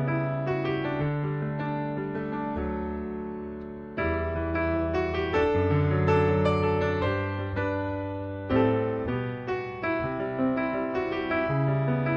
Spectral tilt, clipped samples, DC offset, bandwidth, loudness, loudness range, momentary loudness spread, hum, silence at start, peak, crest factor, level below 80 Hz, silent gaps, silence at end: -9 dB/octave; under 0.1%; under 0.1%; 6.8 kHz; -28 LUFS; 6 LU; 8 LU; none; 0 s; -10 dBFS; 16 dB; -44 dBFS; none; 0 s